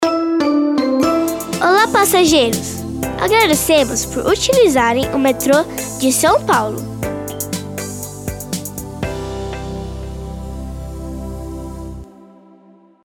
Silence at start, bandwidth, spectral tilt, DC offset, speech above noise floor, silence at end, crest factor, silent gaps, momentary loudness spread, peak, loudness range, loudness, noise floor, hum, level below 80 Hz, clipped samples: 0 s; 19 kHz; -4 dB/octave; under 0.1%; 33 dB; 0.8 s; 16 dB; none; 17 LU; 0 dBFS; 13 LU; -16 LUFS; -47 dBFS; none; -34 dBFS; under 0.1%